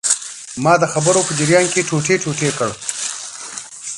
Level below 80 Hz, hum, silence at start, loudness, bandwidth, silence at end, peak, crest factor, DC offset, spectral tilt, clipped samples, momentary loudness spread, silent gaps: -56 dBFS; none; 0.05 s; -17 LUFS; 11.5 kHz; 0 s; 0 dBFS; 18 dB; under 0.1%; -3.5 dB/octave; under 0.1%; 14 LU; none